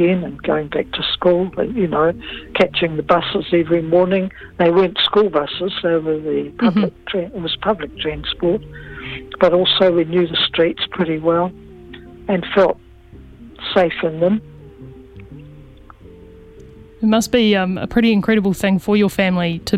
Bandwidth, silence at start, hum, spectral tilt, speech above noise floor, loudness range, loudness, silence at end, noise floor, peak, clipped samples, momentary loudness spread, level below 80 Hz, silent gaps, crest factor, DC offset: 15.5 kHz; 0 s; none; -6 dB/octave; 24 dB; 6 LU; -17 LUFS; 0 s; -41 dBFS; 0 dBFS; under 0.1%; 10 LU; -44 dBFS; none; 18 dB; under 0.1%